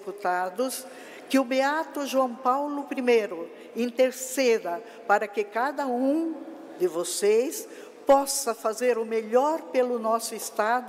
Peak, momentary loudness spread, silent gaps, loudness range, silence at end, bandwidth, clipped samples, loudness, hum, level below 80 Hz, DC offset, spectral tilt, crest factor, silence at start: -10 dBFS; 11 LU; none; 2 LU; 0 s; 16 kHz; under 0.1%; -26 LUFS; none; -72 dBFS; under 0.1%; -2.5 dB/octave; 16 dB; 0 s